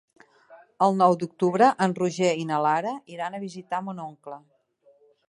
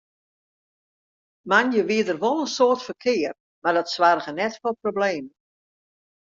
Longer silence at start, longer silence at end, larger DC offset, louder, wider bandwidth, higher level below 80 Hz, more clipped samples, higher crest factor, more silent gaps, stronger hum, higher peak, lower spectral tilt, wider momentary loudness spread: second, 0.5 s vs 1.45 s; second, 0.9 s vs 1.05 s; neither; about the same, -24 LUFS vs -22 LUFS; first, 11.5 kHz vs 7.6 kHz; about the same, -74 dBFS vs -70 dBFS; neither; about the same, 20 dB vs 22 dB; second, none vs 3.40-3.62 s; neither; about the same, -6 dBFS vs -4 dBFS; first, -6 dB/octave vs -4 dB/octave; first, 18 LU vs 8 LU